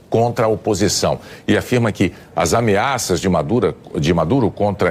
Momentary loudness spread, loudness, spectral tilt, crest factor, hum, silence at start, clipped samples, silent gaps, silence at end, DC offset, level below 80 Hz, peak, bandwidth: 5 LU; -17 LUFS; -5 dB/octave; 12 dB; none; 0.1 s; under 0.1%; none; 0 s; under 0.1%; -42 dBFS; -4 dBFS; 16 kHz